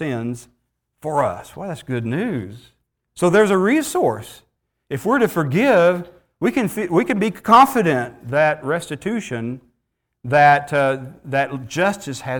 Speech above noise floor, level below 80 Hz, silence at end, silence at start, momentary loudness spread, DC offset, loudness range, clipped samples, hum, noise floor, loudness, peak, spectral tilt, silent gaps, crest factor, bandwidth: 56 dB; -56 dBFS; 0 s; 0 s; 17 LU; under 0.1%; 4 LU; under 0.1%; none; -74 dBFS; -18 LUFS; -2 dBFS; -6 dB/octave; none; 18 dB; over 20 kHz